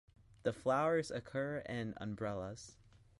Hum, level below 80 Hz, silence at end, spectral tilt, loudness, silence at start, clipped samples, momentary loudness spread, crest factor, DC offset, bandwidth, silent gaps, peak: none; -66 dBFS; 0.45 s; -6 dB/octave; -39 LUFS; 0.45 s; under 0.1%; 12 LU; 18 dB; under 0.1%; 11.5 kHz; none; -22 dBFS